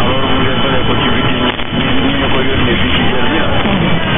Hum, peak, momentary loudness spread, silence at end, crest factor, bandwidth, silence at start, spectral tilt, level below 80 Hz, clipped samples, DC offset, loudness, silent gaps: none; 0 dBFS; 2 LU; 0 s; 10 dB; 3.8 kHz; 0 s; -9.5 dB/octave; -26 dBFS; under 0.1%; under 0.1%; -13 LUFS; none